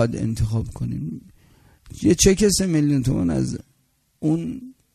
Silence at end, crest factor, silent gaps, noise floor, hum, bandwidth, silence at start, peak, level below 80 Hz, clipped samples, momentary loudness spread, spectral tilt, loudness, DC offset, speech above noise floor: 0.25 s; 20 dB; none; -65 dBFS; none; 13.5 kHz; 0 s; -2 dBFS; -38 dBFS; under 0.1%; 17 LU; -5 dB/octave; -21 LUFS; under 0.1%; 45 dB